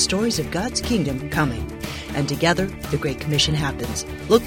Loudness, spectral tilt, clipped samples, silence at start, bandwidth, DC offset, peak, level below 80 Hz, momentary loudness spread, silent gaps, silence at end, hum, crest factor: -23 LUFS; -4 dB/octave; under 0.1%; 0 s; 17 kHz; under 0.1%; -2 dBFS; -38 dBFS; 9 LU; none; 0 s; none; 20 dB